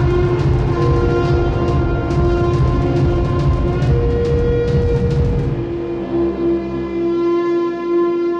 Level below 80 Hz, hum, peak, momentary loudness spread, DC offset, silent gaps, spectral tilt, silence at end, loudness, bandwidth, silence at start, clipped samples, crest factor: -22 dBFS; none; -4 dBFS; 4 LU; under 0.1%; none; -9 dB/octave; 0 s; -17 LUFS; 7.6 kHz; 0 s; under 0.1%; 12 dB